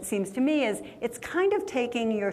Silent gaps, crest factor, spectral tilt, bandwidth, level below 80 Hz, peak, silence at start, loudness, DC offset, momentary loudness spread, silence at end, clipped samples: none; 14 dB; -4.5 dB/octave; 15 kHz; -64 dBFS; -14 dBFS; 0 s; -28 LUFS; under 0.1%; 8 LU; 0 s; under 0.1%